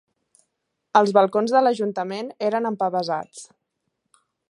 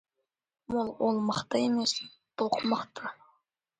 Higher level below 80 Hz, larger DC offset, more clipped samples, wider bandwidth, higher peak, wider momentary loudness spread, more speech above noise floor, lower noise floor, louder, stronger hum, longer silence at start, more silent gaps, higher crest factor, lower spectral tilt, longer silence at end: second, -78 dBFS vs -68 dBFS; neither; neither; first, 11 kHz vs 9.4 kHz; first, -2 dBFS vs -14 dBFS; about the same, 12 LU vs 13 LU; about the same, 56 dB vs 55 dB; second, -77 dBFS vs -84 dBFS; first, -21 LUFS vs -30 LUFS; neither; first, 0.95 s vs 0.7 s; neither; about the same, 22 dB vs 18 dB; first, -5.5 dB/octave vs -4 dB/octave; first, 1.05 s vs 0.65 s